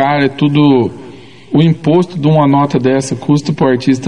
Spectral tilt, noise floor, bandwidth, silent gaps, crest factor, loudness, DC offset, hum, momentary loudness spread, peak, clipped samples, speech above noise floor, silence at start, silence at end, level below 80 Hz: -7 dB/octave; -34 dBFS; 10.5 kHz; none; 12 dB; -12 LUFS; 0.8%; none; 5 LU; 0 dBFS; under 0.1%; 23 dB; 0 s; 0 s; -52 dBFS